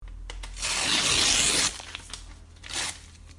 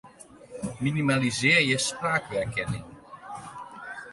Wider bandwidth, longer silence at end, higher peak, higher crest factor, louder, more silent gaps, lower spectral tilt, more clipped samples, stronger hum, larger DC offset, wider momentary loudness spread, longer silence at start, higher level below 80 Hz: about the same, 11.5 kHz vs 11.5 kHz; about the same, 0 s vs 0 s; about the same, -8 dBFS vs -8 dBFS; about the same, 22 dB vs 20 dB; about the same, -23 LUFS vs -25 LUFS; neither; second, 0 dB/octave vs -4 dB/octave; neither; neither; neither; about the same, 22 LU vs 21 LU; about the same, 0 s vs 0.05 s; first, -44 dBFS vs -56 dBFS